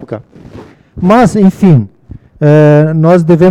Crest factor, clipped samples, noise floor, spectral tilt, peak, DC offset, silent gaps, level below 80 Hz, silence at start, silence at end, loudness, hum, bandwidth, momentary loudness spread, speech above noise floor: 8 dB; 2%; -33 dBFS; -8.5 dB/octave; 0 dBFS; under 0.1%; none; -38 dBFS; 0 s; 0 s; -7 LUFS; none; 10.5 kHz; 16 LU; 27 dB